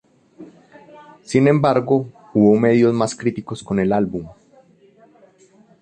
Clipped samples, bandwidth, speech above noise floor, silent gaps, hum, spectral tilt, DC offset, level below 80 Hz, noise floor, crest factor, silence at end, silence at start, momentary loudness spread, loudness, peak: under 0.1%; 9.8 kHz; 36 dB; none; none; -7 dB/octave; under 0.1%; -54 dBFS; -52 dBFS; 16 dB; 1.5 s; 0.4 s; 11 LU; -17 LUFS; -2 dBFS